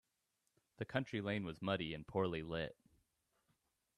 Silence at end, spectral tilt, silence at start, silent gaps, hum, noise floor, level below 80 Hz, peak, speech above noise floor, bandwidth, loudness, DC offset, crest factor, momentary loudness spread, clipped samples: 1.25 s; -7 dB/octave; 0.8 s; none; none; -86 dBFS; -70 dBFS; -24 dBFS; 44 dB; 12.5 kHz; -42 LUFS; under 0.1%; 22 dB; 5 LU; under 0.1%